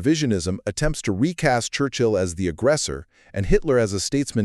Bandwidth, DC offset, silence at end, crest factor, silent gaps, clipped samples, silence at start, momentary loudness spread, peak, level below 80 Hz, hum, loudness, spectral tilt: 13 kHz; under 0.1%; 0 s; 18 dB; none; under 0.1%; 0 s; 6 LU; -4 dBFS; -34 dBFS; none; -22 LUFS; -5 dB/octave